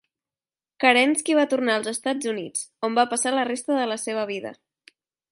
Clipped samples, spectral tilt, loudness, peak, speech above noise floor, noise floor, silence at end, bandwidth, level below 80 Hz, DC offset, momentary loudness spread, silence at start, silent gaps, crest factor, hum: under 0.1%; -2 dB/octave; -23 LUFS; -2 dBFS; over 67 dB; under -90 dBFS; 0.8 s; 11.5 kHz; -78 dBFS; under 0.1%; 10 LU; 0.8 s; none; 22 dB; none